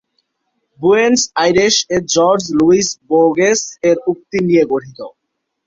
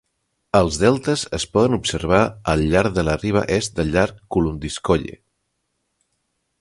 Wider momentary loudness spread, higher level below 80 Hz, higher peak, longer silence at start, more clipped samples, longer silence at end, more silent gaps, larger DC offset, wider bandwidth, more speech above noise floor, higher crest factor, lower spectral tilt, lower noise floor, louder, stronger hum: about the same, 7 LU vs 5 LU; second, -52 dBFS vs -36 dBFS; about the same, 0 dBFS vs 0 dBFS; first, 0.8 s vs 0.55 s; neither; second, 0.6 s vs 1.5 s; neither; neither; second, 7.8 kHz vs 11.5 kHz; first, 60 dB vs 54 dB; second, 14 dB vs 20 dB; second, -3.5 dB/octave vs -5.5 dB/octave; about the same, -74 dBFS vs -73 dBFS; first, -13 LUFS vs -20 LUFS; neither